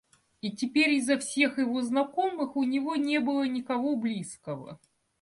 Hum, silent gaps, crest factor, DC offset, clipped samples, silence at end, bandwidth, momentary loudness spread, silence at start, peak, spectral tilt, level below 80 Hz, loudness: none; none; 18 dB; under 0.1%; under 0.1%; 0.45 s; 11.5 kHz; 14 LU; 0.45 s; -12 dBFS; -4 dB/octave; -74 dBFS; -28 LUFS